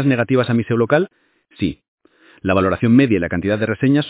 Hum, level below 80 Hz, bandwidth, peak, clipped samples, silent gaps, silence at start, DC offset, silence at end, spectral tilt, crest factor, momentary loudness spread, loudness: none; -42 dBFS; 4 kHz; 0 dBFS; under 0.1%; 1.88-1.98 s; 0 s; under 0.1%; 0 s; -11.5 dB/octave; 16 dB; 10 LU; -17 LUFS